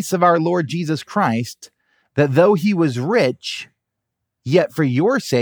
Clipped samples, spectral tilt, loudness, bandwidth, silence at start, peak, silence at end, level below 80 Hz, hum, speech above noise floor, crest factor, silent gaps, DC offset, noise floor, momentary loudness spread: under 0.1%; -6 dB/octave; -18 LUFS; over 20 kHz; 0 s; -2 dBFS; 0 s; -68 dBFS; none; 61 dB; 18 dB; none; under 0.1%; -79 dBFS; 12 LU